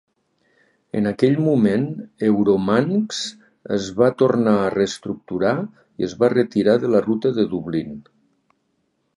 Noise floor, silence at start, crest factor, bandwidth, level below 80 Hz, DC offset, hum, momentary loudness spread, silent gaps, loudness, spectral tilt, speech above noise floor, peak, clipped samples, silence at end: -69 dBFS; 0.95 s; 18 dB; 11 kHz; -56 dBFS; under 0.1%; none; 11 LU; none; -20 LUFS; -6.5 dB/octave; 50 dB; -2 dBFS; under 0.1%; 1.15 s